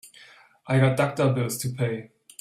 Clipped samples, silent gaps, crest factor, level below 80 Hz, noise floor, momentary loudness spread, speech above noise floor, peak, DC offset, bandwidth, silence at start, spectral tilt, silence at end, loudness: under 0.1%; none; 18 dB; -60 dBFS; -52 dBFS; 10 LU; 29 dB; -8 dBFS; under 0.1%; 14.5 kHz; 0.05 s; -6 dB/octave; 0.35 s; -24 LUFS